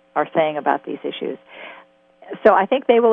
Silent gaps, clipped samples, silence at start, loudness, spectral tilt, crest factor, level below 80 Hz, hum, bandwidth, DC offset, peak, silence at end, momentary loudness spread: none; under 0.1%; 0.15 s; -19 LUFS; -7.5 dB/octave; 18 dB; -64 dBFS; none; 4.3 kHz; under 0.1%; -2 dBFS; 0 s; 22 LU